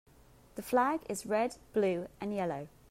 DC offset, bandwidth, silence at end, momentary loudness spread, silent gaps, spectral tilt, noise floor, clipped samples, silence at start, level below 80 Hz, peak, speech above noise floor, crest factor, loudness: under 0.1%; 16 kHz; 0.25 s; 12 LU; none; -5.5 dB/octave; -60 dBFS; under 0.1%; 0.55 s; -64 dBFS; -16 dBFS; 27 dB; 18 dB; -34 LUFS